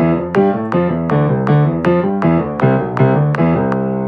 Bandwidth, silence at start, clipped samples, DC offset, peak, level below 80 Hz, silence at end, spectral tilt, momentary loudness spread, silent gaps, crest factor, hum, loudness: 6 kHz; 0 s; under 0.1%; under 0.1%; 0 dBFS; -42 dBFS; 0 s; -10 dB/octave; 3 LU; none; 14 dB; none; -14 LUFS